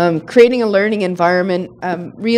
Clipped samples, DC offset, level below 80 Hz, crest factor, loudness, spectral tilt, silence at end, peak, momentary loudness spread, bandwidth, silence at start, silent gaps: 0.2%; under 0.1%; -58 dBFS; 14 dB; -15 LUFS; -6.5 dB/octave; 0 s; 0 dBFS; 12 LU; 10.5 kHz; 0 s; none